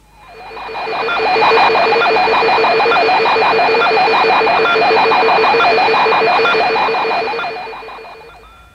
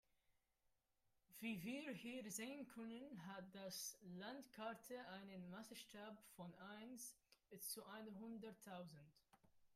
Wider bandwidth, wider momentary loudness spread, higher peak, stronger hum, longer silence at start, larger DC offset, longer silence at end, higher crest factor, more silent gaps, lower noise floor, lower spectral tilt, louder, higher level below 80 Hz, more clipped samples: second, 9.6 kHz vs 15.5 kHz; first, 14 LU vs 8 LU; first, 0 dBFS vs -38 dBFS; neither; about the same, 0.3 s vs 0.3 s; neither; first, 0.45 s vs 0 s; second, 12 dB vs 18 dB; neither; second, -39 dBFS vs -86 dBFS; about the same, -4 dB/octave vs -3.5 dB/octave; first, -12 LUFS vs -55 LUFS; first, -50 dBFS vs -88 dBFS; neither